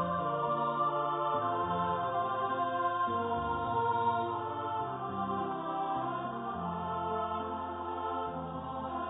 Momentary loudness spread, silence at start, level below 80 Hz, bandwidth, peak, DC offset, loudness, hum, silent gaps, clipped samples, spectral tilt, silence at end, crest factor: 6 LU; 0 s; -58 dBFS; 3.9 kHz; -20 dBFS; under 0.1%; -34 LUFS; none; none; under 0.1%; -2.5 dB/octave; 0 s; 14 dB